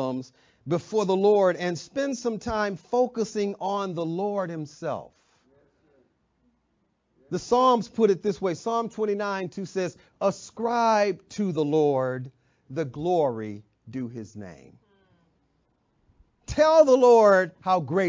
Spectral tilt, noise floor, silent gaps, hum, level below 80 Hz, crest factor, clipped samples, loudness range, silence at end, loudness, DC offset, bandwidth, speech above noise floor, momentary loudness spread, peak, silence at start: -6 dB/octave; -72 dBFS; none; none; -58 dBFS; 20 dB; under 0.1%; 10 LU; 0 s; -24 LUFS; under 0.1%; 7.6 kHz; 48 dB; 16 LU; -6 dBFS; 0 s